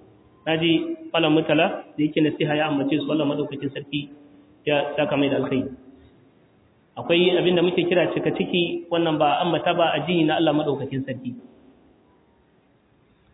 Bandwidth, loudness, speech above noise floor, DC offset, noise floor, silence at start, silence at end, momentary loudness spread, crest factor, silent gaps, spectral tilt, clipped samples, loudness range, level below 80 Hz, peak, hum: 4 kHz; -22 LUFS; 38 dB; under 0.1%; -60 dBFS; 0.45 s; 1.95 s; 12 LU; 16 dB; none; -9.5 dB/octave; under 0.1%; 5 LU; -62 dBFS; -6 dBFS; none